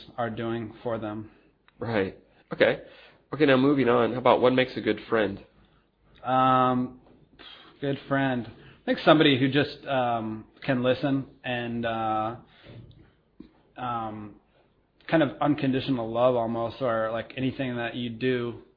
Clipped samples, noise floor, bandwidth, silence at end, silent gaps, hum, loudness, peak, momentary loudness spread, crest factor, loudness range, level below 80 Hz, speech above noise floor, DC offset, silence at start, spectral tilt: under 0.1%; -64 dBFS; 5.2 kHz; 0.15 s; none; none; -26 LUFS; -4 dBFS; 16 LU; 22 dB; 7 LU; -60 dBFS; 39 dB; under 0.1%; 0 s; -9 dB/octave